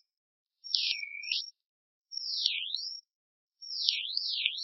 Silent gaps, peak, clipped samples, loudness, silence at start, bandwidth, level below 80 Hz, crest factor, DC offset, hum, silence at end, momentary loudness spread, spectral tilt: 1.66-2.02 s, 3.15-3.47 s; -4 dBFS; under 0.1%; -31 LUFS; 0.65 s; 6.2 kHz; under -90 dBFS; 32 dB; under 0.1%; none; 0 s; 15 LU; 14 dB/octave